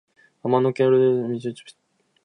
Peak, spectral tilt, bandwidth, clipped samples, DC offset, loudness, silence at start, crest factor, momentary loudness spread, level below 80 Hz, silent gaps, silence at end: -6 dBFS; -8 dB/octave; 10 kHz; under 0.1%; under 0.1%; -21 LUFS; 0.45 s; 16 dB; 15 LU; -72 dBFS; none; 0.55 s